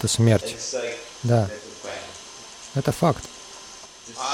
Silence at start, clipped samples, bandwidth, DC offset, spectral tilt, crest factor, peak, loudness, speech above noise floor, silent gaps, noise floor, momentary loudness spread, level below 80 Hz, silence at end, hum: 0 s; under 0.1%; 16 kHz; under 0.1%; -5 dB/octave; 18 dB; -6 dBFS; -25 LUFS; 20 dB; none; -43 dBFS; 19 LU; -52 dBFS; 0 s; none